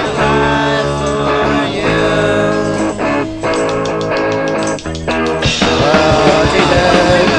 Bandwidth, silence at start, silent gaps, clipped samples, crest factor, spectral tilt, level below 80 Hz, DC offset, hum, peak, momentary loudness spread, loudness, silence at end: 10 kHz; 0 s; none; under 0.1%; 12 dB; -5 dB/octave; -30 dBFS; under 0.1%; none; 0 dBFS; 6 LU; -13 LUFS; 0 s